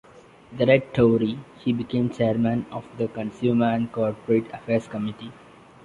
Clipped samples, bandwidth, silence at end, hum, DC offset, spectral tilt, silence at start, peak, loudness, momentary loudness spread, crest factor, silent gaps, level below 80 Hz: under 0.1%; 7.6 kHz; 0.5 s; none; under 0.1%; -8.5 dB/octave; 0.5 s; -4 dBFS; -24 LUFS; 11 LU; 20 dB; none; -56 dBFS